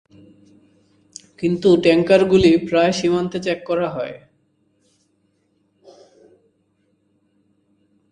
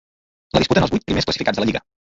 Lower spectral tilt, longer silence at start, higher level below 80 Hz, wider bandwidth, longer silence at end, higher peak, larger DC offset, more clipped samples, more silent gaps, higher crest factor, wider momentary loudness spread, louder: about the same, -6 dB/octave vs -5.5 dB/octave; first, 1.4 s vs 0.55 s; second, -50 dBFS vs -40 dBFS; first, 9.8 kHz vs 7.8 kHz; first, 3.95 s vs 0.4 s; about the same, 0 dBFS vs -2 dBFS; neither; neither; neither; about the same, 20 dB vs 20 dB; first, 17 LU vs 5 LU; about the same, -17 LUFS vs -19 LUFS